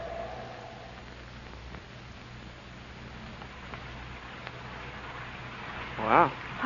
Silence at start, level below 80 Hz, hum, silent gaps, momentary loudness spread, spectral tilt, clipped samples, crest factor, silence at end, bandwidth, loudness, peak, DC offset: 0 s; -52 dBFS; none; none; 20 LU; -3.5 dB/octave; under 0.1%; 28 dB; 0 s; 7.2 kHz; -34 LUFS; -6 dBFS; under 0.1%